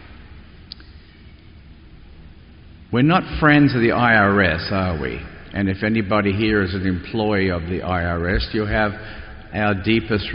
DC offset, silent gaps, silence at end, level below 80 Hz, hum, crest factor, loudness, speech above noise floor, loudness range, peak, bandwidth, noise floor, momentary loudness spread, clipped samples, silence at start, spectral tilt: under 0.1%; none; 0 s; -36 dBFS; none; 18 dB; -19 LUFS; 25 dB; 5 LU; -2 dBFS; 5.4 kHz; -44 dBFS; 17 LU; under 0.1%; 0 s; -5 dB/octave